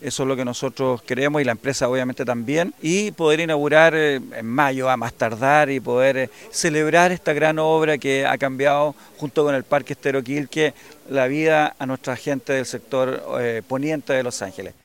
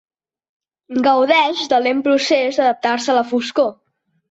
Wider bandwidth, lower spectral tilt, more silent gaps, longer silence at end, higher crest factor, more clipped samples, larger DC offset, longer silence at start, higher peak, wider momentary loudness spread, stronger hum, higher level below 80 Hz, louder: first, 17 kHz vs 8.2 kHz; first, -4.5 dB/octave vs -2.5 dB/octave; neither; second, 0.15 s vs 0.6 s; first, 20 dB vs 14 dB; neither; first, 0.1% vs under 0.1%; second, 0 s vs 0.9 s; first, 0 dBFS vs -4 dBFS; first, 9 LU vs 6 LU; neither; first, -60 dBFS vs -66 dBFS; second, -20 LUFS vs -16 LUFS